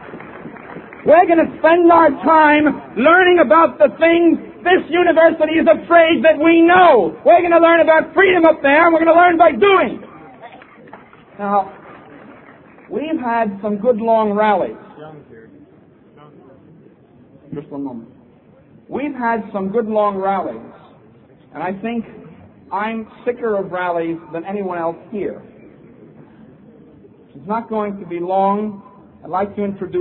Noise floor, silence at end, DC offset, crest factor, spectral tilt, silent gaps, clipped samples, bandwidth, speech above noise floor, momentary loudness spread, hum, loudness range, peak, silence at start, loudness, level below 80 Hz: -47 dBFS; 0 s; under 0.1%; 16 dB; -9.5 dB/octave; none; under 0.1%; 4.2 kHz; 33 dB; 18 LU; none; 17 LU; 0 dBFS; 0 s; -14 LUFS; -54 dBFS